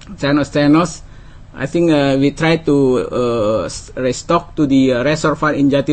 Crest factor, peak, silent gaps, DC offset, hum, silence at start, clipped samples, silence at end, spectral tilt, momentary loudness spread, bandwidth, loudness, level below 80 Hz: 14 dB; -2 dBFS; none; under 0.1%; none; 0.1 s; under 0.1%; 0 s; -6 dB/octave; 8 LU; 8.8 kHz; -15 LUFS; -38 dBFS